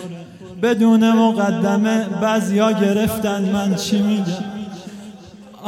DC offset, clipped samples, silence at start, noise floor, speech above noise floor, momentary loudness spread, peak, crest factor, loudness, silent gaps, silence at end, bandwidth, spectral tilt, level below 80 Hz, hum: under 0.1%; under 0.1%; 0 s; -40 dBFS; 23 dB; 20 LU; -4 dBFS; 14 dB; -17 LUFS; none; 0 s; 16.5 kHz; -6 dB/octave; -54 dBFS; none